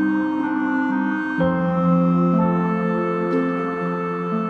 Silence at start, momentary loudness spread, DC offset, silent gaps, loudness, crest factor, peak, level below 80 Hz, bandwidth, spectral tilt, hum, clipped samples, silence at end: 0 s; 6 LU; under 0.1%; none; -21 LUFS; 14 dB; -6 dBFS; -54 dBFS; 4.7 kHz; -9.5 dB/octave; none; under 0.1%; 0 s